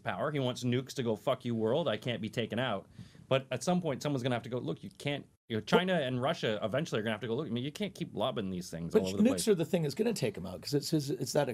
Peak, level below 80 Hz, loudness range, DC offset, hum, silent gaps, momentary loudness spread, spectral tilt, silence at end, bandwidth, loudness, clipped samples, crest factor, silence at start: -12 dBFS; -70 dBFS; 3 LU; under 0.1%; none; 5.37-5.48 s; 9 LU; -5.5 dB/octave; 0 s; 16 kHz; -33 LUFS; under 0.1%; 20 dB; 0.05 s